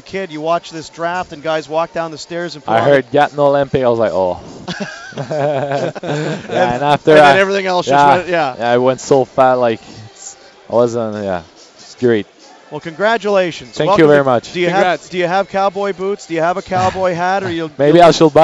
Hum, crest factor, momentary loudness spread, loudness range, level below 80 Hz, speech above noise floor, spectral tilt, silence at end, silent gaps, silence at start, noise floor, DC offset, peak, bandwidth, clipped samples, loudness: none; 14 dB; 15 LU; 6 LU; -50 dBFS; 22 dB; -5.5 dB/octave; 0 s; none; 0.05 s; -36 dBFS; under 0.1%; 0 dBFS; 10.5 kHz; 0.2%; -14 LUFS